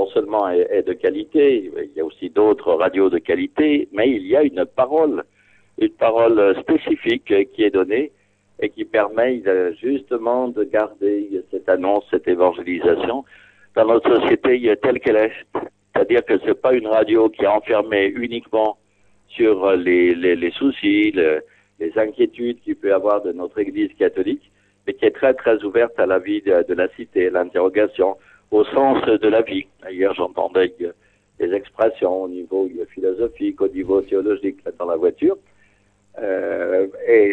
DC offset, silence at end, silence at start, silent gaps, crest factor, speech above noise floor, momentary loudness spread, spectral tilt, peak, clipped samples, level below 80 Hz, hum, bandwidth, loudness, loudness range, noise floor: under 0.1%; 0 s; 0 s; none; 16 dB; 40 dB; 9 LU; -7.5 dB/octave; -4 dBFS; under 0.1%; -56 dBFS; none; 4.2 kHz; -19 LUFS; 4 LU; -58 dBFS